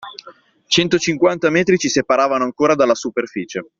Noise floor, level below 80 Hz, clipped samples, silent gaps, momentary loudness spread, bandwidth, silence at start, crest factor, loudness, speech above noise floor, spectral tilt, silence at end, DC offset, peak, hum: -45 dBFS; -56 dBFS; under 0.1%; none; 9 LU; 7.8 kHz; 0 s; 16 dB; -16 LUFS; 29 dB; -4 dB/octave; 0.15 s; under 0.1%; 0 dBFS; none